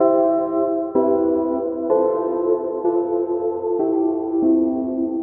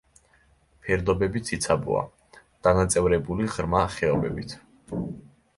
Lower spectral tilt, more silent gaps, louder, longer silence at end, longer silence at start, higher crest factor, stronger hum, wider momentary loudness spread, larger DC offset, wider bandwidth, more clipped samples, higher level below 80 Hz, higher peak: first, -10.5 dB/octave vs -5.5 dB/octave; neither; first, -20 LUFS vs -25 LUFS; second, 0 s vs 0.3 s; second, 0 s vs 0.85 s; second, 14 dB vs 20 dB; neither; second, 5 LU vs 15 LU; neither; second, 2.1 kHz vs 11.5 kHz; neither; second, -58 dBFS vs -42 dBFS; about the same, -6 dBFS vs -6 dBFS